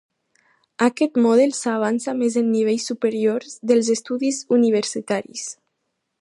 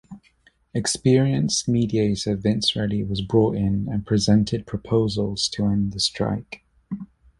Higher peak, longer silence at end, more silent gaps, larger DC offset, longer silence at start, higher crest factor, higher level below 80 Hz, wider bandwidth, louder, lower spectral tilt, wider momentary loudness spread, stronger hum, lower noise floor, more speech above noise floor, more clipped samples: about the same, -4 dBFS vs -6 dBFS; first, 0.7 s vs 0.35 s; neither; neither; first, 0.8 s vs 0.1 s; about the same, 16 dB vs 18 dB; second, -74 dBFS vs -46 dBFS; about the same, 11.5 kHz vs 11.5 kHz; about the same, -20 LUFS vs -22 LUFS; second, -4 dB/octave vs -5.5 dB/octave; second, 8 LU vs 12 LU; neither; first, -76 dBFS vs -60 dBFS; first, 56 dB vs 38 dB; neither